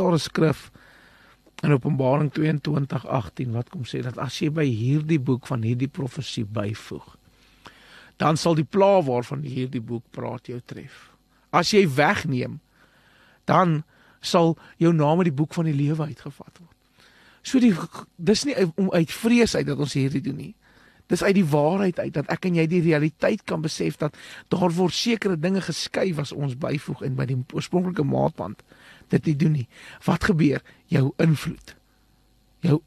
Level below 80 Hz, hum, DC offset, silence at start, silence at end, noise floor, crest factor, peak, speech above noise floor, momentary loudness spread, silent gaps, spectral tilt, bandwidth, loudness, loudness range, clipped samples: -54 dBFS; none; under 0.1%; 0 s; 0.05 s; -61 dBFS; 20 dB; -4 dBFS; 38 dB; 13 LU; none; -6.5 dB/octave; 13 kHz; -23 LUFS; 3 LU; under 0.1%